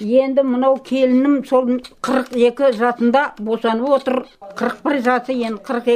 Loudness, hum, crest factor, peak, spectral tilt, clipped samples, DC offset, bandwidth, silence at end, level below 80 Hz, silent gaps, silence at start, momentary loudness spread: -17 LUFS; none; 14 dB; -2 dBFS; -5.5 dB/octave; under 0.1%; under 0.1%; 12.5 kHz; 0 s; -58 dBFS; none; 0 s; 7 LU